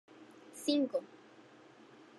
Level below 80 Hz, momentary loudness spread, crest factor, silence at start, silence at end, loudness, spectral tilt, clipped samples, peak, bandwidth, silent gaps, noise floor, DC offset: under -90 dBFS; 26 LU; 22 dB; 0.2 s; 1.15 s; -35 LUFS; -3.5 dB/octave; under 0.1%; -18 dBFS; 12 kHz; none; -59 dBFS; under 0.1%